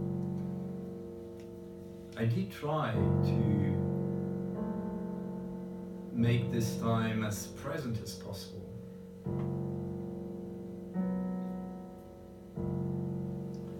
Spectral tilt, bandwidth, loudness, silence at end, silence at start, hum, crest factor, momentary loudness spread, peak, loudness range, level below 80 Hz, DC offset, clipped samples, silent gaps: -7 dB/octave; 17.5 kHz; -35 LUFS; 0 s; 0 s; none; 18 dB; 16 LU; -16 dBFS; 7 LU; -60 dBFS; under 0.1%; under 0.1%; none